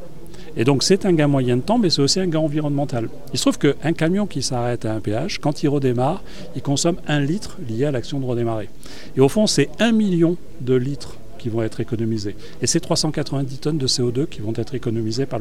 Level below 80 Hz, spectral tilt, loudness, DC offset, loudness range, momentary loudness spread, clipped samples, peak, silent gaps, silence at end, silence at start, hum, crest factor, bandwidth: -44 dBFS; -5 dB/octave; -21 LUFS; 4%; 4 LU; 11 LU; under 0.1%; -2 dBFS; none; 0 s; 0 s; none; 18 dB; 15.5 kHz